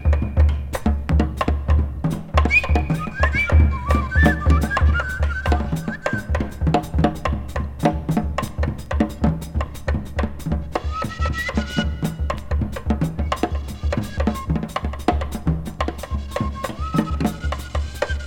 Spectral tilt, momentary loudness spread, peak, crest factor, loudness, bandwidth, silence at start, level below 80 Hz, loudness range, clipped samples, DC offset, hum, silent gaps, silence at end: -7 dB/octave; 9 LU; 0 dBFS; 20 dB; -22 LUFS; 14.5 kHz; 0 s; -24 dBFS; 6 LU; under 0.1%; under 0.1%; none; none; 0 s